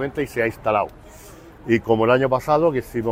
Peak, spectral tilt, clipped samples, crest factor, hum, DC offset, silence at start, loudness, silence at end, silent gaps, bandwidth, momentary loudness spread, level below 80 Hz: -4 dBFS; -7 dB/octave; under 0.1%; 16 dB; none; under 0.1%; 0 s; -20 LUFS; 0 s; none; 16 kHz; 7 LU; -46 dBFS